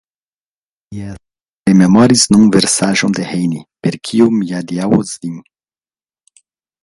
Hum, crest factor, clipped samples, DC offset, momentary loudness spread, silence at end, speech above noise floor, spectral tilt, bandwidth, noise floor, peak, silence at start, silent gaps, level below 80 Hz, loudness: none; 14 dB; under 0.1%; under 0.1%; 20 LU; 1.4 s; over 77 dB; -4.5 dB/octave; 11.5 kHz; under -90 dBFS; 0 dBFS; 0.9 s; 1.49-1.63 s; -46 dBFS; -12 LUFS